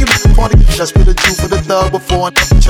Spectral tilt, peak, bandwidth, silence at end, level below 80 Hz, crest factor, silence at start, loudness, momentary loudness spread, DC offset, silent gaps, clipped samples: -4.5 dB/octave; 0 dBFS; 16.5 kHz; 0 s; -10 dBFS; 8 dB; 0 s; -11 LUFS; 4 LU; under 0.1%; none; under 0.1%